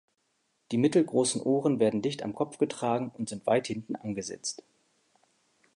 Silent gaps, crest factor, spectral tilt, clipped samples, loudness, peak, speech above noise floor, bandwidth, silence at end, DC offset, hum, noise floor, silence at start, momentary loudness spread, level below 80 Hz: none; 18 dB; -5 dB/octave; under 0.1%; -29 LUFS; -12 dBFS; 47 dB; 11.5 kHz; 1.2 s; under 0.1%; none; -75 dBFS; 0.7 s; 11 LU; -72 dBFS